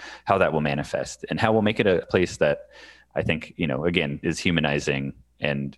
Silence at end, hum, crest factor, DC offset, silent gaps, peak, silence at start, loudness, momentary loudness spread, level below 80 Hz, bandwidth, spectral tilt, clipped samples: 0.05 s; none; 22 dB; under 0.1%; none; -2 dBFS; 0 s; -24 LUFS; 9 LU; -50 dBFS; 12 kHz; -5.5 dB/octave; under 0.1%